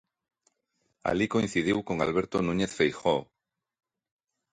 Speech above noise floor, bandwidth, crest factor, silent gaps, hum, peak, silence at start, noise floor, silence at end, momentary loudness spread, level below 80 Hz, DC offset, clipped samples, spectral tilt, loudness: 50 dB; 10.5 kHz; 20 dB; none; none; -10 dBFS; 1.05 s; -77 dBFS; 1.3 s; 4 LU; -56 dBFS; under 0.1%; under 0.1%; -5.5 dB/octave; -28 LUFS